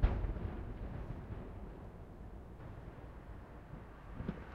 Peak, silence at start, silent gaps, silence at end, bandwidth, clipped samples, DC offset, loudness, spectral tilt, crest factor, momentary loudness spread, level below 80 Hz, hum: -18 dBFS; 0 s; none; 0 s; 5.2 kHz; under 0.1%; under 0.1%; -47 LUFS; -9 dB/octave; 24 dB; 10 LU; -44 dBFS; none